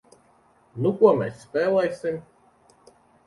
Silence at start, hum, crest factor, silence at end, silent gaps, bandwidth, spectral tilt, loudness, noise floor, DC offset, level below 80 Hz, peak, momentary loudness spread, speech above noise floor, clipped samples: 0.75 s; none; 20 dB; 1.05 s; none; 11.5 kHz; -7.5 dB/octave; -23 LUFS; -60 dBFS; under 0.1%; -66 dBFS; -4 dBFS; 14 LU; 38 dB; under 0.1%